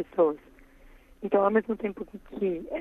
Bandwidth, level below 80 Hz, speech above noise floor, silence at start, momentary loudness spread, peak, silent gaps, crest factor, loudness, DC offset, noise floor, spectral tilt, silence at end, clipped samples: 4 kHz; -56 dBFS; 26 dB; 0 s; 17 LU; -10 dBFS; none; 18 dB; -27 LUFS; under 0.1%; -54 dBFS; -9 dB/octave; 0 s; under 0.1%